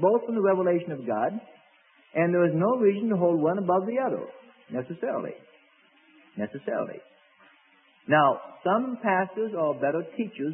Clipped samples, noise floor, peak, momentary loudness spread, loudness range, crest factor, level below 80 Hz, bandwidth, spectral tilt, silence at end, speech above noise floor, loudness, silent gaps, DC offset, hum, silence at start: under 0.1%; -61 dBFS; -8 dBFS; 13 LU; 10 LU; 18 dB; -78 dBFS; 3.5 kHz; -11 dB/octave; 0 s; 35 dB; -26 LUFS; none; under 0.1%; none; 0 s